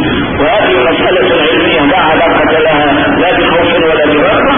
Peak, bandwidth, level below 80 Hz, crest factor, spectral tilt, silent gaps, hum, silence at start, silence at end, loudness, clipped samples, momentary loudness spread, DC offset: 0 dBFS; 3.7 kHz; -30 dBFS; 8 dB; -9 dB/octave; none; none; 0 s; 0 s; -8 LUFS; under 0.1%; 1 LU; under 0.1%